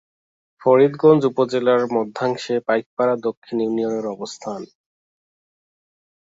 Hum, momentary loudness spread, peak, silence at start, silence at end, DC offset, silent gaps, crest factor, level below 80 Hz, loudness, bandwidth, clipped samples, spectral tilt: none; 14 LU; -2 dBFS; 0.6 s; 1.65 s; under 0.1%; 2.86-2.97 s, 3.37-3.42 s; 20 dB; -68 dBFS; -19 LUFS; 7.8 kHz; under 0.1%; -6.5 dB/octave